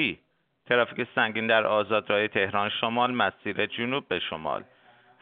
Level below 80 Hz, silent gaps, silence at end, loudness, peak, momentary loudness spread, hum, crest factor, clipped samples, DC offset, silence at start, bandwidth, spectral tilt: -68 dBFS; none; 0.6 s; -26 LUFS; -6 dBFS; 8 LU; none; 20 dB; under 0.1%; under 0.1%; 0 s; 4.7 kHz; -1.5 dB/octave